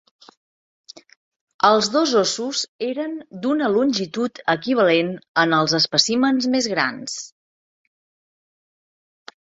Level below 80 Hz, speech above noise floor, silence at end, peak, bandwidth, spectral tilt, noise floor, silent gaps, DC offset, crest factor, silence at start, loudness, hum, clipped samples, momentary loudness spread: -66 dBFS; over 70 dB; 2.25 s; -2 dBFS; 8 kHz; -3.5 dB/octave; under -90 dBFS; 2.68-2.79 s, 5.28-5.34 s; under 0.1%; 20 dB; 1.65 s; -20 LUFS; none; under 0.1%; 11 LU